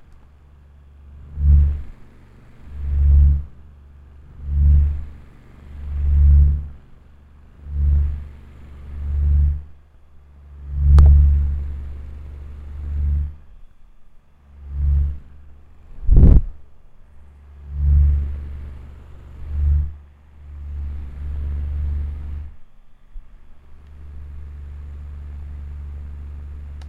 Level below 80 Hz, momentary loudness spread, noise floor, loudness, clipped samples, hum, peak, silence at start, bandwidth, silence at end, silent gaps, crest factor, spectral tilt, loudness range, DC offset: -20 dBFS; 24 LU; -47 dBFS; -20 LUFS; under 0.1%; none; 0 dBFS; 1.1 s; 2.1 kHz; 0 s; none; 20 dB; -10.5 dB/octave; 12 LU; under 0.1%